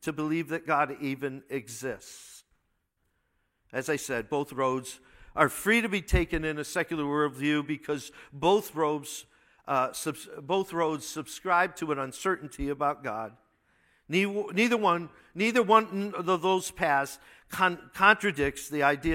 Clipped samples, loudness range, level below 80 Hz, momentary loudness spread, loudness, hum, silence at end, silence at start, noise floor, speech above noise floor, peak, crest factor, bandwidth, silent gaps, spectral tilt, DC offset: under 0.1%; 8 LU; -46 dBFS; 14 LU; -28 LUFS; none; 0 s; 0 s; -76 dBFS; 47 dB; -4 dBFS; 24 dB; 16.5 kHz; none; -4.5 dB/octave; under 0.1%